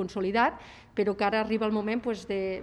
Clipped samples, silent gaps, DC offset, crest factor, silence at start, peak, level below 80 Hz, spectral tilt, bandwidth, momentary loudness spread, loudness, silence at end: under 0.1%; none; under 0.1%; 18 dB; 0 s; -10 dBFS; -58 dBFS; -6 dB/octave; 10.5 kHz; 6 LU; -28 LUFS; 0 s